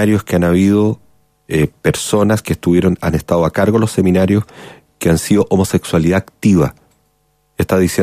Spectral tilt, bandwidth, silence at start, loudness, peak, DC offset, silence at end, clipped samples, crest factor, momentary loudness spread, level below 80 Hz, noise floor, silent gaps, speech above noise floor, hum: -6.5 dB/octave; 15.5 kHz; 0 s; -14 LUFS; 0 dBFS; under 0.1%; 0 s; under 0.1%; 14 dB; 6 LU; -40 dBFS; -60 dBFS; none; 47 dB; none